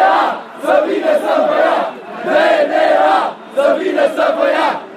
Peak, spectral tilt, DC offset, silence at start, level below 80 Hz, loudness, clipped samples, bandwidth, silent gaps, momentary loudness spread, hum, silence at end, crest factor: 0 dBFS; -4 dB/octave; under 0.1%; 0 s; -64 dBFS; -14 LUFS; under 0.1%; 14 kHz; none; 7 LU; none; 0 s; 12 dB